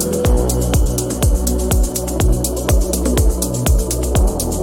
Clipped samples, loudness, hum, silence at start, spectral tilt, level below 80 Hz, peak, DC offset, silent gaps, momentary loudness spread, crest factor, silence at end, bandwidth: under 0.1%; -17 LUFS; none; 0 s; -5 dB/octave; -18 dBFS; -2 dBFS; under 0.1%; none; 2 LU; 12 dB; 0 s; 18 kHz